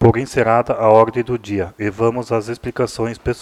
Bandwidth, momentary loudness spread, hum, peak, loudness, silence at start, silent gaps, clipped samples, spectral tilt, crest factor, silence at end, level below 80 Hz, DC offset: 13 kHz; 10 LU; none; 0 dBFS; -17 LUFS; 0 s; none; under 0.1%; -7 dB/octave; 16 dB; 0 s; -42 dBFS; under 0.1%